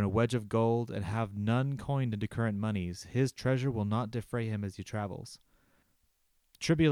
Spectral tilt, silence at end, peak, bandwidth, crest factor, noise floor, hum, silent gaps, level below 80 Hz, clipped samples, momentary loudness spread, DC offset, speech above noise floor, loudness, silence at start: -7 dB/octave; 0 s; -14 dBFS; 13.5 kHz; 18 dB; -73 dBFS; none; none; -58 dBFS; under 0.1%; 8 LU; under 0.1%; 42 dB; -33 LUFS; 0 s